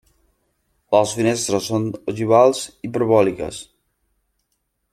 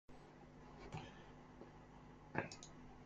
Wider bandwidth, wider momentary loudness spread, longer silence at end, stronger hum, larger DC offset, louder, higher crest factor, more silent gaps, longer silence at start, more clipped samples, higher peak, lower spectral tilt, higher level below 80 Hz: first, 15.5 kHz vs 9 kHz; about the same, 13 LU vs 14 LU; first, 1.3 s vs 0 s; second, none vs 50 Hz at -65 dBFS; neither; first, -19 LUFS vs -54 LUFS; second, 20 dB vs 30 dB; neither; first, 0.9 s vs 0.1 s; neither; first, -2 dBFS vs -24 dBFS; about the same, -5 dB/octave vs -5 dB/octave; first, -56 dBFS vs -68 dBFS